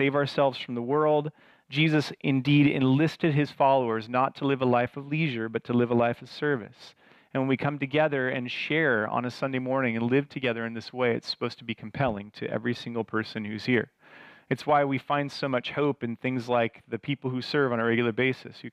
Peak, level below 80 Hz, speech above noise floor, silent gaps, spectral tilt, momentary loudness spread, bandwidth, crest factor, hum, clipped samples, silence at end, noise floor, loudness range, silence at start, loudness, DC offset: -10 dBFS; -66 dBFS; 25 dB; none; -7 dB/octave; 9 LU; 10.5 kHz; 16 dB; none; under 0.1%; 0.05 s; -52 dBFS; 5 LU; 0 s; -27 LUFS; under 0.1%